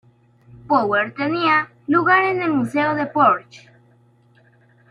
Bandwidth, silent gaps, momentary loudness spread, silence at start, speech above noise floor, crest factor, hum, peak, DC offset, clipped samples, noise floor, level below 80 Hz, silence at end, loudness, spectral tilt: 11.5 kHz; none; 5 LU; 0.55 s; 37 dB; 18 dB; none; -4 dBFS; under 0.1%; under 0.1%; -55 dBFS; -64 dBFS; 1.35 s; -18 LUFS; -6.5 dB/octave